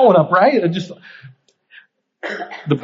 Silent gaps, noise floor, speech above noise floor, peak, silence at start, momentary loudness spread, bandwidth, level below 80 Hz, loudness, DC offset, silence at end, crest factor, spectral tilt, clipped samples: none; -49 dBFS; 33 dB; 0 dBFS; 0 s; 20 LU; 7.6 kHz; -68 dBFS; -16 LUFS; under 0.1%; 0 s; 16 dB; -5 dB/octave; under 0.1%